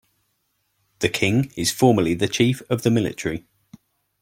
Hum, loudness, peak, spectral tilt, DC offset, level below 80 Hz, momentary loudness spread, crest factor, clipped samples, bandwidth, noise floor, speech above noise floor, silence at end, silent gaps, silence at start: none; -21 LUFS; -2 dBFS; -5 dB/octave; under 0.1%; -54 dBFS; 9 LU; 20 dB; under 0.1%; 16.5 kHz; -71 dBFS; 51 dB; 0.85 s; none; 1 s